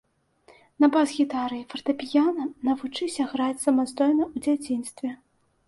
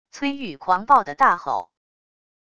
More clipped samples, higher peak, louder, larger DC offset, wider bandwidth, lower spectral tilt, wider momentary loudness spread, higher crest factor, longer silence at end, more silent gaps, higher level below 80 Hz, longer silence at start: neither; second, -10 dBFS vs -4 dBFS; second, -25 LUFS vs -20 LUFS; neither; first, 11.5 kHz vs 9.2 kHz; about the same, -3.5 dB/octave vs -4.5 dB/octave; about the same, 9 LU vs 11 LU; about the same, 16 dB vs 20 dB; second, 0.55 s vs 0.8 s; neither; about the same, -66 dBFS vs -62 dBFS; first, 0.8 s vs 0.15 s